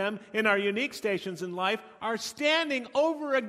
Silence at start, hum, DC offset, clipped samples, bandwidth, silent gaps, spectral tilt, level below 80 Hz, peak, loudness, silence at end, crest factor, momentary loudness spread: 0 s; none; under 0.1%; under 0.1%; 16 kHz; none; -3.5 dB/octave; -74 dBFS; -10 dBFS; -28 LUFS; 0 s; 20 dB; 7 LU